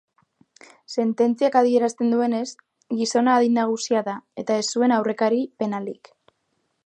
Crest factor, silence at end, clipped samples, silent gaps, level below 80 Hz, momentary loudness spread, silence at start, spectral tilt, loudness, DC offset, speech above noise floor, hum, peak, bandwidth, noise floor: 18 dB; 0.9 s; under 0.1%; none; -78 dBFS; 12 LU; 0.9 s; -4.5 dB/octave; -22 LUFS; under 0.1%; 51 dB; none; -4 dBFS; 9.4 kHz; -72 dBFS